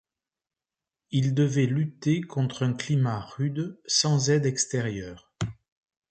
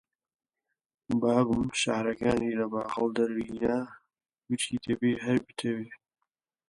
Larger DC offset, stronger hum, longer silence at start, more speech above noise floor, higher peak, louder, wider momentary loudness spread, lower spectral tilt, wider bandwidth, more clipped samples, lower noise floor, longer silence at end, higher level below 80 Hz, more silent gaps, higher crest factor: neither; neither; about the same, 1.1 s vs 1.1 s; first, over 64 dB vs 56 dB; about the same, -10 dBFS vs -12 dBFS; first, -26 LUFS vs -29 LUFS; first, 12 LU vs 8 LU; about the same, -5 dB/octave vs -5 dB/octave; second, 9 kHz vs 11.5 kHz; neither; first, under -90 dBFS vs -85 dBFS; second, 0.6 s vs 0.75 s; about the same, -58 dBFS vs -58 dBFS; neither; about the same, 18 dB vs 18 dB